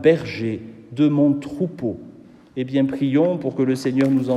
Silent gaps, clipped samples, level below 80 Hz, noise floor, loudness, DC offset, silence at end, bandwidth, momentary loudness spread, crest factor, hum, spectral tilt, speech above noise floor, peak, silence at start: none; under 0.1%; -60 dBFS; -44 dBFS; -21 LUFS; under 0.1%; 0 s; 12 kHz; 13 LU; 18 dB; none; -8 dB/octave; 25 dB; -2 dBFS; 0 s